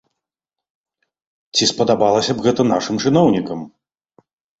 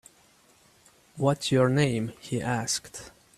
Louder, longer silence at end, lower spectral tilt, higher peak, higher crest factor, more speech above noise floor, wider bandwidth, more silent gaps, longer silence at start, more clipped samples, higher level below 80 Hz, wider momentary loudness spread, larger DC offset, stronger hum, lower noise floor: first, -16 LUFS vs -27 LUFS; first, 0.9 s vs 0.3 s; about the same, -4.5 dB/octave vs -5 dB/octave; first, -2 dBFS vs -10 dBFS; about the same, 18 dB vs 20 dB; first, 70 dB vs 34 dB; second, 8.2 kHz vs 14 kHz; neither; first, 1.55 s vs 1.15 s; neither; first, -54 dBFS vs -62 dBFS; about the same, 11 LU vs 9 LU; neither; neither; first, -86 dBFS vs -60 dBFS